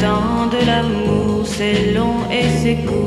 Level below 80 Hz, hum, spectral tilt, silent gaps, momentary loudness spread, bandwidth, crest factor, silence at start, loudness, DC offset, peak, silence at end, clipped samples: -32 dBFS; none; -6 dB/octave; none; 2 LU; 13 kHz; 14 dB; 0 s; -17 LUFS; under 0.1%; -2 dBFS; 0 s; under 0.1%